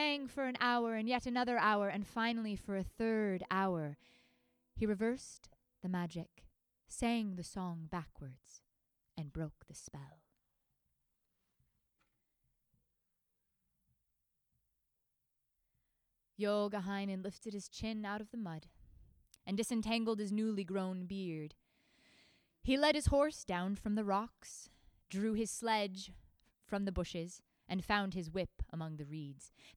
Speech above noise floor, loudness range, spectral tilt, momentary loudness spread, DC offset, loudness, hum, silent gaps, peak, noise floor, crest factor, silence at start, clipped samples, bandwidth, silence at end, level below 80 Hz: 46 dB; 12 LU; -5 dB/octave; 18 LU; under 0.1%; -38 LUFS; none; none; -18 dBFS; -84 dBFS; 22 dB; 0 s; under 0.1%; over 20 kHz; 0.05 s; -58 dBFS